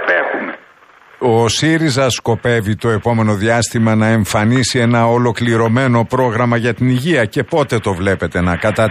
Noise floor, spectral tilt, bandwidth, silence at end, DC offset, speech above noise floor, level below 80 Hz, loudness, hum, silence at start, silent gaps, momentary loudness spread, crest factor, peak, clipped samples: -45 dBFS; -5.5 dB/octave; 15 kHz; 0 s; under 0.1%; 31 dB; -42 dBFS; -14 LUFS; none; 0 s; none; 4 LU; 12 dB; -2 dBFS; under 0.1%